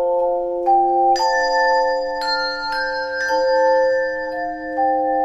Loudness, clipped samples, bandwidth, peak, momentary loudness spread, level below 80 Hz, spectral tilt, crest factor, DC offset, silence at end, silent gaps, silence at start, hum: -18 LUFS; under 0.1%; 10.5 kHz; -6 dBFS; 7 LU; -50 dBFS; -2.5 dB/octave; 12 dB; under 0.1%; 0 s; none; 0 s; none